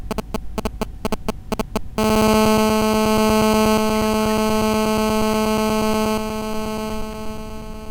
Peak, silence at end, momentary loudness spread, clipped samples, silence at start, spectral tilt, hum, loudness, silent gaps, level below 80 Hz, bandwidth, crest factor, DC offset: -4 dBFS; 0 s; 13 LU; under 0.1%; 0 s; -5 dB/octave; none; -19 LUFS; none; -34 dBFS; 18 kHz; 16 dB; under 0.1%